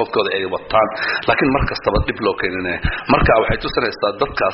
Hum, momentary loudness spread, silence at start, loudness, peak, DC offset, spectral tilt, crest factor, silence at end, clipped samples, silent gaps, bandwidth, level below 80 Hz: none; 6 LU; 0 s; -18 LUFS; -2 dBFS; under 0.1%; -3.5 dB/octave; 16 dB; 0 s; under 0.1%; none; 6 kHz; -30 dBFS